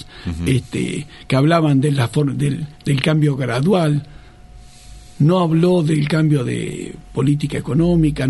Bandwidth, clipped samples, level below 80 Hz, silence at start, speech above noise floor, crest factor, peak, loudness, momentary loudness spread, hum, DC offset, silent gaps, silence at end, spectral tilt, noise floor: 12 kHz; under 0.1%; -40 dBFS; 0 s; 24 dB; 18 dB; 0 dBFS; -18 LUFS; 10 LU; none; under 0.1%; none; 0 s; -7 dB/octave; -40 dBFS